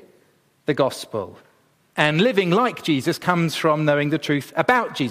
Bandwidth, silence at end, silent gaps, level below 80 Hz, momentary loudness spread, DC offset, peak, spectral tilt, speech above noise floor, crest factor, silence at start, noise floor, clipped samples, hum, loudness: 15.5 kHz; 0 s; none; -64 dBFS; 12 LU; under 0.1%; -2 dBFS; -5.5 dB/octave; 40 dB; 20 dB; 0.7 s; -60 dBFS; under 0.1%; none; -21 LUFS